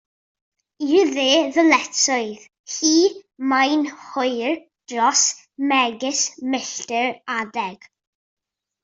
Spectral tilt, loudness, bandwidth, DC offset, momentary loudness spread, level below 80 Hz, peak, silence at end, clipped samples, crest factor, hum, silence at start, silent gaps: -1 dB/octave; -20 LUFS; 7.8 kHz; under 0.1%; 12 LU; -70 dBFS; -2 dBFS; 1.1 s; under 0.1%; 20 dB; none; 0.8 s; 2.59-2.64 s